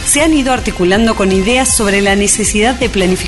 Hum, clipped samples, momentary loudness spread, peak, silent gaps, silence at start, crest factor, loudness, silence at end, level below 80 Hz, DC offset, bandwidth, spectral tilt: none; under 0.1%; 3 LU; 0 dBFS; none; 0 s; 12 dB; -11 LUFS; 0 s; -26 dBFS; under 0.1%; 12 kHz; -3.5 dB/octave